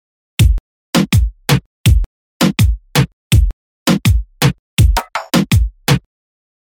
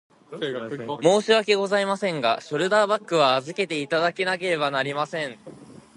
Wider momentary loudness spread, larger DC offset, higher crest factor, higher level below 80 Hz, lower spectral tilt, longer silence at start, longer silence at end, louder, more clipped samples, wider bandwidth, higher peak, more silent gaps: second, 5 LU vs 12 LU; neither; second, 12 dB vs 20 dB; first, -20 dBFS vs -72 dBFS; about the same, -5 dB/octave vs -4 dB/octave; about the same, 0.4 s vs 0.3 s; first, 0.65 s vs 0.15 s; first, -15 LUFS vs -23 LUFS; neither; first, 19.5 kHz vs 11.5 kHz; about the same, -2 dBFS vs -4 dBFS; first, 0.60-0.93 s, 1.66-1.84 s, 2.06-2.40 s, 3.13-3.30 s, 3.53-3.86 s, 4.59-4.77 s vs none